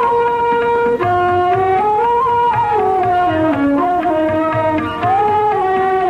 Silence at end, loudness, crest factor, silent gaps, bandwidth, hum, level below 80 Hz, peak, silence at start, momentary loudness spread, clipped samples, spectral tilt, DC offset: 0 s; -14 LUFS; 10 dB; none; 10.5 kHz; none; -44 dBFS; -4 dBFS; 0 s; 2 LU; under 0.1%; -7.5 dB/octave; under 0.1%